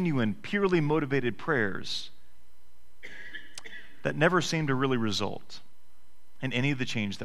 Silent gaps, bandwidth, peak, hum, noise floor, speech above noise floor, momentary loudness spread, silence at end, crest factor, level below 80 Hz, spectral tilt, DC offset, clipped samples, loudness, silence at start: none; 14 kHz; -8 dBFS; none; -65 dBFS; 37 dB; 20 LU; 0 s; 22 dB; -58 dBFS; -5.5 dB/octave; 2%; under 0.1%; -29 LUFS; 0 s